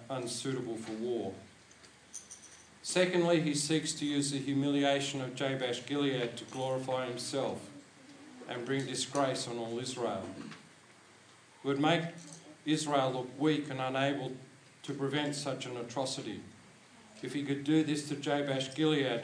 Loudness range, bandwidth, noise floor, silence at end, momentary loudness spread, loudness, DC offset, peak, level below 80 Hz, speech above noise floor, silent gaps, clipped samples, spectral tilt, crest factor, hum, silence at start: 6 LU; 10.5 kHz; -59 dBFS; 0 s; 18 LU; -34 LUFS; under 0.1%; -14 dBFS; -80 dBFS; 26 dB; none; under 0.1%; -4.5 dB/octave; 22 dB; none; 0 s